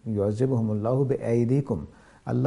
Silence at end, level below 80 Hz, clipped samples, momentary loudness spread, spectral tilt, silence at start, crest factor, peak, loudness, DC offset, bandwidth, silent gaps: 0 s; -54 dBFS; under 0.1%; 9 LU; -10 dB/octave; 0.05 s; 14 dB; -10 dBFS; -26 LUFS; under 0.1%; 11 kHz; none